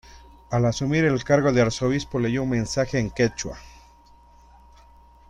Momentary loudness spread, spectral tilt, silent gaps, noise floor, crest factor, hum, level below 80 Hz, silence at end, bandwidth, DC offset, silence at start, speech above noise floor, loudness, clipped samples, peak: 7 LU; -6 dB/octave; none; -52 dBFS; 18 dB; 60 Hz at -45 dBFS; -46 dBFS; 1.6 s; 11 kHz; under 0.1%; 0.1 s; 30 dB; -23 LUFS; under 0.1%; -6 dBFS